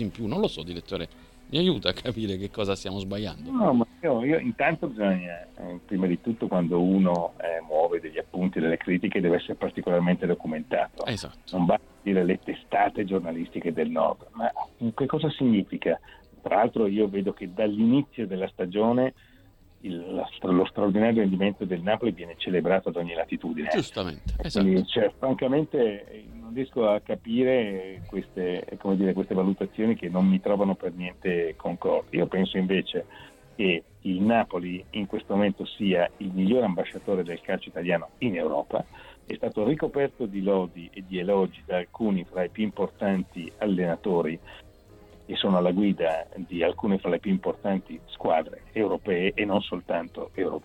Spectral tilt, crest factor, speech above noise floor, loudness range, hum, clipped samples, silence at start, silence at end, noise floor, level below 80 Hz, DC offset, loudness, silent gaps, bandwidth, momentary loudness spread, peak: -7.5 dB/octave; 22 dB; 29 dB; 3 LU; none; under 0.1%; 0 s; 0.05 s; -55 dBFS; -50 dBFS; under 0.1%; -27 LUFS; none; 9.6 kHz; 10 LU; -6 dBFS